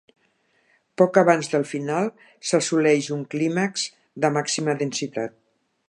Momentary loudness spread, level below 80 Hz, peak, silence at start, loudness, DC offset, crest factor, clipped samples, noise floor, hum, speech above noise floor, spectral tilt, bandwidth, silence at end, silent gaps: 12 LU; -76 dBFS; -2 dBFS; 1 s; -23 LUFS; under 0.1%; 20 dB; under 0.1%; -66 dBFS; none; 44 dB; -4.5 dB/octave; 11.5 kHz; 0.6 s; none